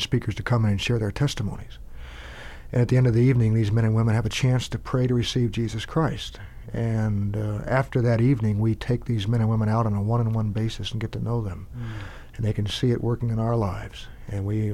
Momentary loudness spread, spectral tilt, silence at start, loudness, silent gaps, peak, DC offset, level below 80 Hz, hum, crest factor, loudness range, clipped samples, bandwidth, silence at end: 15 LU; -7 dB/octave; 0 s; -24 LUFS; none; -8 dBFS; under 0.1%; -40 dBFS; none; 14 dB; 5 LU; under 0.1%; 12 kHz; 0 s